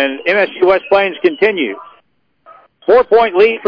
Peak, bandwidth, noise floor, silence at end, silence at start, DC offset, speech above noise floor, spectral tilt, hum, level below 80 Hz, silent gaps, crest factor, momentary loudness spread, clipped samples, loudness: -2 dBFS; 5.4 kHz; -57 dBFS; 0 s; 0 s; under 0.1%; 45 dB; -6.5 dB/octave; none; -52 dBFS; none; 12 dB; 10 LU; under 0.1%; -12 LUFS